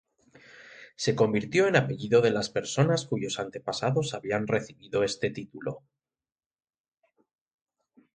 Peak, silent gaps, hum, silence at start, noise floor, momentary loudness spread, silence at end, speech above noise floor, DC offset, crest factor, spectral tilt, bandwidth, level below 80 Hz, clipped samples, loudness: -8 dBFS; none; none; 0.6 s; under -90 dBFS; 14 LU; 2.4 s; over 63 dB; under 0.1%; 20 dB; -5 dB/octave; 9.4 kHz; -64 dBFS; under 0.1%; -28 LUFS